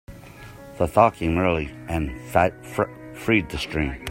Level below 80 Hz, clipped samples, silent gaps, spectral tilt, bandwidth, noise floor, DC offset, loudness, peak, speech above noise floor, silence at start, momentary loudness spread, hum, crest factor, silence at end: -40 dBFS; under 0.1%; none; -6.5 dB/octave; 16.5 kHz; -42 dBFS; under 0.1%; -23 LUFS; 0 dBFS; 20 dB; 0.1 s; 23 LU; none; 22 dB; 0 s